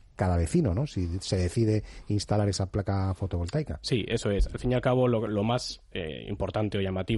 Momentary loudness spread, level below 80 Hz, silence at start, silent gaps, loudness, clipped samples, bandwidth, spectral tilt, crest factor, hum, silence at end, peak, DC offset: 7 LU; -40 dBFS; 0.2 s; none; -29 LUFS; under 0.1%; 11.5 kHz; -6.5 dB/octave; 14 dB; none; 0 s; -14 dBFS; under 0.1%